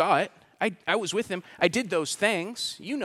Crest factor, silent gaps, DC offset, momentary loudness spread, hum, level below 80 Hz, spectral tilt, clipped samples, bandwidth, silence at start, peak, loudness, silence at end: 22 dB; none; under 0.1%; 7 LU; none; -70 dBFS; -3.5 dB/octave; under 0.1%; 15.5 kHz; 0 s; -6 dBFS; -27 LUFS; 0 s